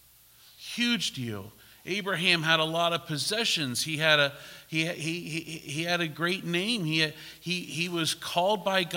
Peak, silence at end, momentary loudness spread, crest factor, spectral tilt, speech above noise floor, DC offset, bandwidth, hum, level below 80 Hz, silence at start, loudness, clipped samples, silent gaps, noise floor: -6 dBFS; 0 s; 12 LU; 22 dB; -3.5 dB/octave; 28 dB; under 0.1%; 16.5 kHz; none; -68 dBFS; 0.6 s; -27 LUFS; under 0.1%; none; -57 dBFS